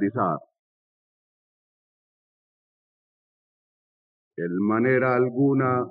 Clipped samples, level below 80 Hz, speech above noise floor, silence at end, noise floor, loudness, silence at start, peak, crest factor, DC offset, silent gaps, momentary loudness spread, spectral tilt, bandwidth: under 0.1%; -86 dBFS; over 68 dB; 0 s; under -90 dBFS; -23 LUFS; 0 s; -10 dBFS; 18 dB; under 0.1%; 0.59-4.31 s; 13 LU; -9 dB/octave; 5 kHz